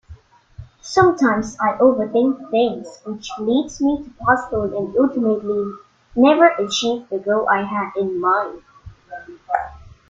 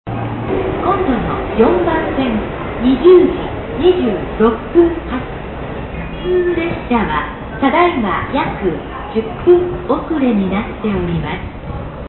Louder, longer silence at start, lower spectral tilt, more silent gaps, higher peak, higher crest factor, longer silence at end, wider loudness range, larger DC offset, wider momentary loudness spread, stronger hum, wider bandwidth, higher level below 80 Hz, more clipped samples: second, -19 LUFS vs -16 LUFS; about the same, 0.1 s vs 0.05 s; second, -5 dB/octave vs -12.5 dB/octave; neither; about the same, -2 dBFS vs 0 dBFS; about the same, 18 dB vs 14 dB; first, 0.2 s vs 0 s; about the same, 3 LU vs 3 LU; neither; first, 15 LU vs 12 LU; neither; first, 7.8 kHz vs 4.2 kHz; second, -50 dBFS vs -30 dBFS; neither